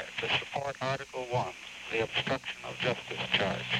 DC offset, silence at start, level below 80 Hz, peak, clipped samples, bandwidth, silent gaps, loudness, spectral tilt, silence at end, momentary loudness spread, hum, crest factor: under 0.1%; 0 s; -62 dBFS; -12 dBFS; under 0.1%; 16 kHz; none; -32 LUFS; -4 dB/octave; 0 s; 7 LU; none; 20 dB